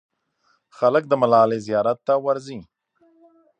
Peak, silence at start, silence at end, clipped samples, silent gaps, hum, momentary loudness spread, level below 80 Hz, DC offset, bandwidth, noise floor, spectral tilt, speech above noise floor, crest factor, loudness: -4 dBFS; 0.8 s; 0.95 s; under 0.1%; none; none; 11 LU; -68 dBFS; under 0.1%; 9 kHz; -66 dBFS; -7 dB/octave; 47 dB; 18 dB; -20 LUFS